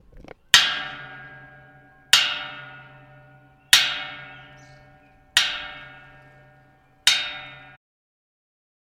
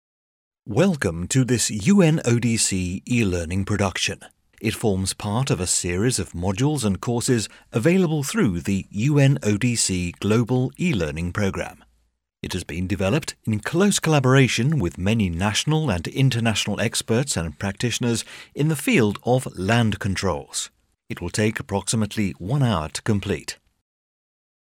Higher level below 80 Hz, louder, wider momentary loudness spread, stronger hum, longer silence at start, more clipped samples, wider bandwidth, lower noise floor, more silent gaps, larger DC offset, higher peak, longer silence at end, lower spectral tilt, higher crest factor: second, -58 dBFS vs -46 dBFS; first, -19 LUFS vs -22 LUFS; first, 25 LU vs 9 LU; neither; second, 0.15 s vs 0.65 s; neither; about the same, 16.5 kHz vs 16.5 kHz; second, -56 dBFS vs -68 dBFS; neither; neither; first, 0 dBFS vs -4 dBFS; first, 1.4 s vs 1.15 s; second, 1.5 dB/octave vs -5 dB/octave; first, 26 dB vs 18 dB